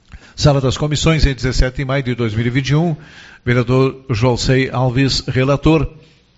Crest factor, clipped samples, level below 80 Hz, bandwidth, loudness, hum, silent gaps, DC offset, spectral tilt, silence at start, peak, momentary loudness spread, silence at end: 16 dB; under 0.1%; -26 dBFS; 8 kHz; -16 LUFS; none; none; under 0.1%; -5.5 dB/octave; 0.15 s; 0 dBFS; 5 LU; 0.5 s